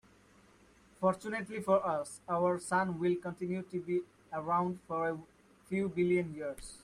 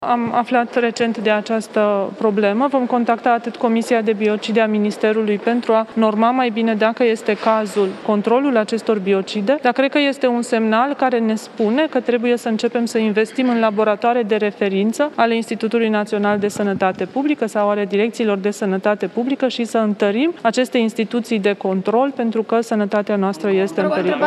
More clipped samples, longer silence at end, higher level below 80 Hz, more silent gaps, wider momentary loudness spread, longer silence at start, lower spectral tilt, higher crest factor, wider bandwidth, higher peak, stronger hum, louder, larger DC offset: neither; about the same, 0.05 s vs 0 s; first, -66 dBFS vs -72 dBFS; neither; first, 8 LU vs 3 LU; first, 1 s vs 0 s; about the same, -6.5 dB/octave vs -5.5 dB/octave; about the same, 18 dB vs 16 dB; about the same, 12.5 kHz vs 12.5 kHz; second, -16 dBFS vs 0 dBFS; neither; second, -34 LUFS vs -18 LUFS; neither